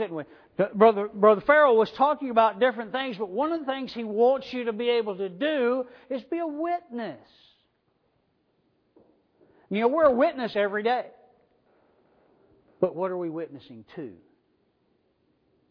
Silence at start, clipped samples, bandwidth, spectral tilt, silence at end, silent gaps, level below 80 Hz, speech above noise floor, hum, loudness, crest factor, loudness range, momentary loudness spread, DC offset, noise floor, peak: 0 s; under 0.1%; 5.4 kHz; -7.5 dB/octave; 1.6 s; none; -68 dBFS; 46 dB; none; -25 LUFS; 22 dB; 13 LU; 17 LU; under 0.1%; -71 dBFS; -4 dBFS